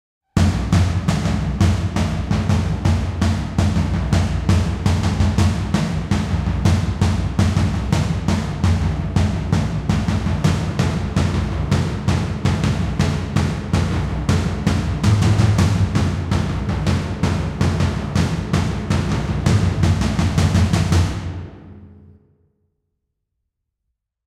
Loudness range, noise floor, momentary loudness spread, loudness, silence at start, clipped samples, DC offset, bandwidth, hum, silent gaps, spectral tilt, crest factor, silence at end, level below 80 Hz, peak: 2 LU; -77 dBFS; 4 LU; -19 LUFS; 0.35 s; under 0.1%; under 0.1%; 12.5 kHz; none; none; -6.5 dB/octave; 14 dB; 2.35 s; -28 dBFS; -4 dBFS